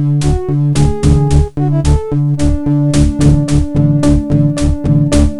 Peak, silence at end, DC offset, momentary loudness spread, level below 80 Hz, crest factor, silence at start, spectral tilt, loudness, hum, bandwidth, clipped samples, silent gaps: 0 dBFS; 0 s; under 0.1%; 4 LU; -18 dBFS; 10 dB; 0 s; -7.5 dB/octave; -12 LUFS; none; 11.5 kHz; under 0.1%; none